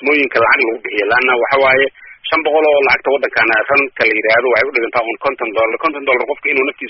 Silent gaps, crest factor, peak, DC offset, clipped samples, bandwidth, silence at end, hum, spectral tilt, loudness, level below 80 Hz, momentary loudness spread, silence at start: none; 14 dB; 0 dBFS; under 0.1%; under 0.1%; 6 kHz; 0 s; none; -0.5 dB/octave; -13 LUFS; -52 dBFS; 6 LU; 0 s